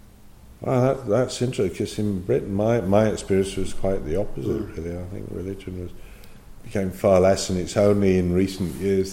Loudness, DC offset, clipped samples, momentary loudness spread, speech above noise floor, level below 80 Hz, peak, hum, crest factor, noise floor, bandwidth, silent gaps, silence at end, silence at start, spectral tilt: -23 LUFS; under 0.1%; under 0.1%; 14 LU; 24 dB; -40 dBFS; -6 dBFS; none; 18 dB; -46 dBFS; 16.5 kHz; none; 0 s; 0.05 s; -6.5 dB/octave